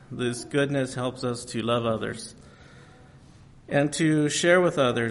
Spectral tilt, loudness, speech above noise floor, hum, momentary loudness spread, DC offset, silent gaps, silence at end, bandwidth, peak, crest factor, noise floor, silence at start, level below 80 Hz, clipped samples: -5 dB/octave; -25 LUFS; 26 dB; none; 11 LU; under 0.1%; none; 0 s; 11.5 kHz; -6 dBFS; 20 dB; -51 dBFS; 0.1 s; -58 dBFS; under 0.1%